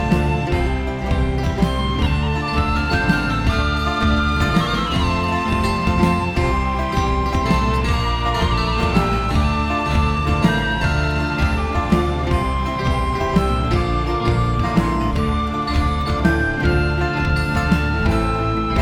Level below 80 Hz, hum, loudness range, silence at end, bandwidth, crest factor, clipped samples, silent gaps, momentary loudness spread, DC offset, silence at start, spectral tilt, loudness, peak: -24 dBFS; none; 1 LU; 0 s; 13.5 kHz; 16 dB; under 0.1%; none; 3 LU; under 0.1%; 0 s; -6.5 dB/octave; -19 LUFS; -2 dBFS